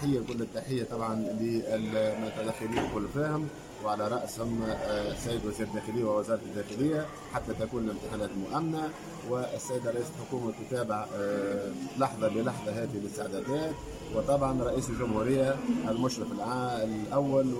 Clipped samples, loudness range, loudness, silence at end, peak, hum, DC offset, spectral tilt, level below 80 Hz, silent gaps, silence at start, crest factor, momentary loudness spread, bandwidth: under 0.1%; 4 LU; -32 LUFS; 0 s; -14 dBFS; none; under 0.1%; -6 dB/octave; -52 dBFS; none; 0 s; 16 dB; 7 LU; 16.5 kHz